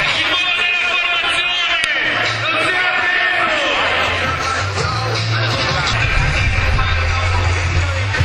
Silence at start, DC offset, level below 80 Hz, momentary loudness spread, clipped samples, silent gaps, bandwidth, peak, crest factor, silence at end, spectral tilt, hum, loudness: 0 s; under 0.1%; -26 dBFS; 4 LU; under 0.1%; none; 11 kHz; 0 dBFS; 16 dB; 0 s; -3.5 dB/octave; none; -15 LUFS